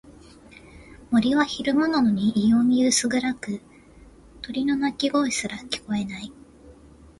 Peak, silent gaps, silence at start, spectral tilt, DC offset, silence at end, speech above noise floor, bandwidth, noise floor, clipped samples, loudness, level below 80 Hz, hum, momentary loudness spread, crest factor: -8 dBFS; none; 0.05 s; -4 dB/octave; under 0.1%; 0.45 s; 27 dB; 11.5 kHz; -49 dBFS; under 0.1%; -23 LUFS; -54 dBFS; none; 14 LU; 18 dB